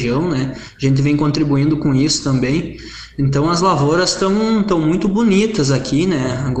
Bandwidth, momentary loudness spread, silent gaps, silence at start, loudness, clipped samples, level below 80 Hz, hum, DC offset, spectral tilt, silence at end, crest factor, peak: 9 kHz; 7 LU; none; 0 s; -16 LUFS; under 0.1%; -38 dBFS; none; under 0.1%; -5.5 dB/octave; 0 s; 14 dB; -2 dBFS